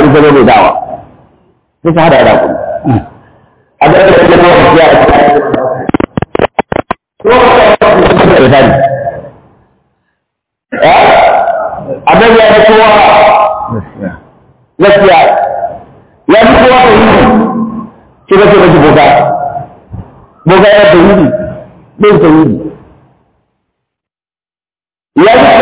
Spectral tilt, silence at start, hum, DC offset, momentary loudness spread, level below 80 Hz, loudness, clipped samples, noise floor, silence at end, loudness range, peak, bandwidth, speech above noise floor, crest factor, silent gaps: -10 dB/octave; 0 s; none; under 0.1%; 15 LU; -30 dBFS; -5 LUFS; 4%; under -90 dBFS; 0 s; 5 LU; 0 dBFS; 4 kHz; over 87 dB; 6 dB; none